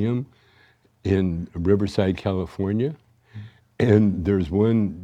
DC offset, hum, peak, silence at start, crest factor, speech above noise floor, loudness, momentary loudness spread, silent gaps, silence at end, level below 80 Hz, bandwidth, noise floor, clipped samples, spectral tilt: under 0.1%; none; -4 dBFS; 0 s; 18 dB; 37 dB; -22 LUFS; 21 LU; none; 0 s; -46 dBFS; 9.4 kHz; -58 dBFS; under 0.1%; -9 dB/octave